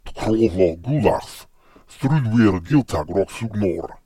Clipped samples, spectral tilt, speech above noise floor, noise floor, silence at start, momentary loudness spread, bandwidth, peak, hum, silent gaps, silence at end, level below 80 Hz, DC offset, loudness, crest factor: under 0.1%; -7.5 dB/octave; 30 dB; -49 dBFS; 0.05 s; 9 LU; 14.5 kHz; -2 dBFS; none; none; 0.1 s; -42 dBFS; under 0.1%; -20 LUFS; 18 dB